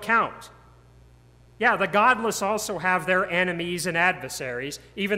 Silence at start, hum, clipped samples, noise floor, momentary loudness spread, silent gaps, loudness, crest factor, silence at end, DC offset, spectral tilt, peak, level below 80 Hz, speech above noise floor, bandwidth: 0 s; none; under 0.1%; -53 dBFS; 11 LU; none; -24 LUFS; 20 dB; 0 s; under 0.1%; -3.5 dB/octave; -6 dBFS; -58 dBFS; 29 dB; 16 kHz